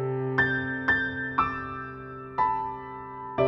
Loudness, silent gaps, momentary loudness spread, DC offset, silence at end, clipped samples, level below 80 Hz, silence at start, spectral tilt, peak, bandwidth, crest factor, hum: -28 LUFS; none; 14 LU; under 0.1%; 0 s; under 0.1%; -54 dBFS; 0 s; -8 dB/octave; -10 dBFS; 6.8 kHz; 18 dB; none